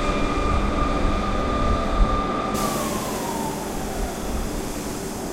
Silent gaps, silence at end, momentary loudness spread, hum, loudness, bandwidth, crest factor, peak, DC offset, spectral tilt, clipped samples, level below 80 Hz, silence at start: none; 0 s; 6 LU; none; -25 LUFS; 16 kHz; 18 dB; -6 dBFS; under 0.1%; -5 dB/octave; under 0.1%; -28 dBFS; 0 s